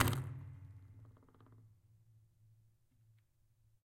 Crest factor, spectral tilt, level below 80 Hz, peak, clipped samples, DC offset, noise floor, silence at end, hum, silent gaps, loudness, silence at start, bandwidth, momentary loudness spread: 36 dB; -5 dB/octave; -64 dBFS; -10 dBFS; under 0.1%; under 0.1%; -73 dBFS; 2.15 s; none; none; -44 LUFS; 0 s; 16 kHz; 24 LU